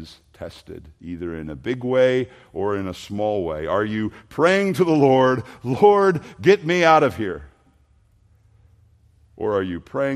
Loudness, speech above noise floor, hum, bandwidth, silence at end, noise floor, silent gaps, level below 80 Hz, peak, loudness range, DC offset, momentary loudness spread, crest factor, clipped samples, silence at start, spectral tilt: -20 LUFS; 38 dB; none; 13 kHz; 0 s; -58 dBFS; none; -54 dBFS; -2 dBFS; 7 LU; under 0.1%; 20 LU; 20 dB; under 0.1%; 0 s; -6.5 dB/octave